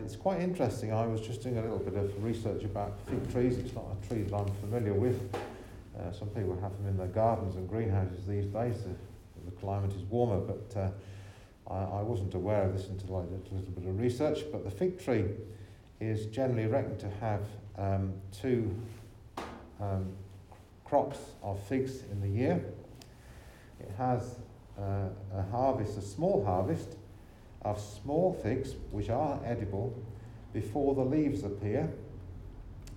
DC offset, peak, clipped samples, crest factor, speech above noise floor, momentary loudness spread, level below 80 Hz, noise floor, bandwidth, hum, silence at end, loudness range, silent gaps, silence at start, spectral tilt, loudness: under 0.1%; -14 dBFS; under 0.1%; 20 dB; 21 dB; 18 LU; -54 dBFS; -54 dBFS; 13 kHz; none; 0 s; 3 LU; none; 0 s; -8 dB/octave; -34 LUFS